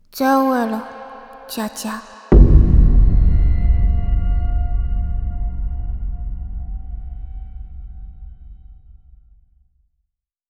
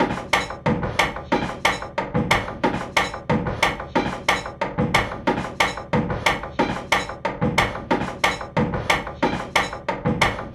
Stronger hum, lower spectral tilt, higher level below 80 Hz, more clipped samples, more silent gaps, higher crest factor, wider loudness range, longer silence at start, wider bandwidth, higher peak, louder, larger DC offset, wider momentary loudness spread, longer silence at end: neither; first, -7.5 dB/octave vs -4.5 dB/octave; first, -18 dBFS vs -40 dBFS; neither; neither; about the same, 16 dB vs 18 dB; first, 19 LU vs 0 LU; first, 0.15 s vs 0 s; second, 14.5 kHz vs 16 kHz; first, 0 dBFS vs -4 dBFS; first, -19 LUFS vs -22 LUFS; neither; first, 23 LU vs 4 LU; first, 1.95 s vs 0 s